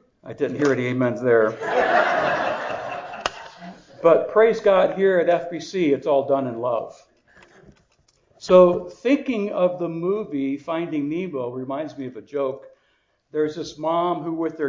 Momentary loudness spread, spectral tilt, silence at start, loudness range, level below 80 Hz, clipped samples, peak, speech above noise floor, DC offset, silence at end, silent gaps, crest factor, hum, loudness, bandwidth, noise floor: 13 LU; -6.5 dB/octave; 0.25 s; 8 LU; -62 dBFS; under 0.1%; -2 dBFS; 46 dB; under 0.1%; 0 s; none; 20 dB; none; -22 LUFS; 7.6 kHz; -66 dBFS